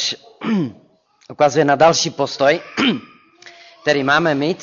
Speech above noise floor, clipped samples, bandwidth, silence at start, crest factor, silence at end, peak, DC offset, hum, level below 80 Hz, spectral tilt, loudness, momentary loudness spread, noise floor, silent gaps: 28 dB; under 0.1%; 7.6 kHz; 0 s; 16 dB; 0 s; -2 dBFS; under 0.1%; none; -58 dBFS; -4 dB/octave; -17 LUFS; 11 LU; -44 dBFS; none